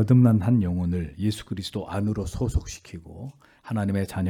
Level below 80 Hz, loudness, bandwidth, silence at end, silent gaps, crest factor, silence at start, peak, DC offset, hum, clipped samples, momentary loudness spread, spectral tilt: -40 dBFS; -25 LUFS; 14.5 kHz; 0 s; none; 16 dB; 0 s; -8 dBFS; under 0.1%; none; under 0.1%; 21 LU; -7.5 dB/octave